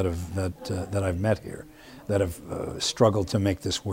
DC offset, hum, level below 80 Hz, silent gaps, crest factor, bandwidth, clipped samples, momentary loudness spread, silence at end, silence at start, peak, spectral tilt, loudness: under 0.1%; none; -46 dBFS; none; 22 dB; 16 kHz; under 0.1%; 15 LU; 0 s; 0 s; -6 dBFS; -5.5 dB/octave; -27 LUFS